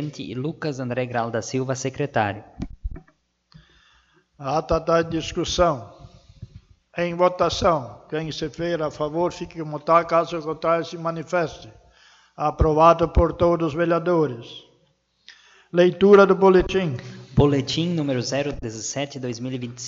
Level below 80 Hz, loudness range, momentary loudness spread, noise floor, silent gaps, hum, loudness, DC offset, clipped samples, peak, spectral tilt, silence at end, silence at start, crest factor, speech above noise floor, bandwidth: -38 dBFS; 8 LU; 15 LU; -65 dBFS; none; none; -22 LUFS; under 0.1%; under 0.1%; -2 dBFS; -6 dB/octave; 0 s; 0 s; 20 dB; 44 dB; 7.8 kHz